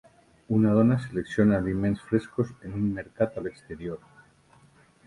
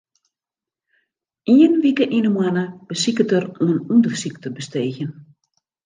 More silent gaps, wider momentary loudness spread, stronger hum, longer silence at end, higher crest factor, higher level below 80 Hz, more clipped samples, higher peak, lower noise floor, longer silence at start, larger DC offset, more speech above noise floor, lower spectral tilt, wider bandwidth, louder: neither; about the same, 15 LU vs 15 LU; neither; first, 1.1 s vs 0.65 s; about the same, 20 dB vs 16 dB; first, -52 dBFS vs -68 dBFS; neither; second, -8 dBFS vs -2 dBFS; second, -59 dBFS vs -90 dBFS; second, 0.5 s vs 1.45 s; neither; second, 33 dB vs 72 dB; first, -9 dB/octave vs -5.5 dB/octave; first, 11 kHz vs 9.8 kHz; second, -26 LUFS vs -18 LUFS